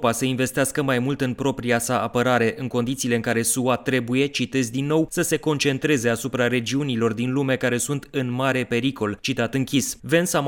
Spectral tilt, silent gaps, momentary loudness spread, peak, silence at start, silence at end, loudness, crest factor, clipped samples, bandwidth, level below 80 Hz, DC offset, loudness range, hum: -4.5 dB/octave; none; 4 LU; -6 dBFS; 0 s; 0 s; -22 LUFS; 16 dB; under 0.1%; 17.5 kHz; -54 dBFS; under 0.1%; 1 LU; none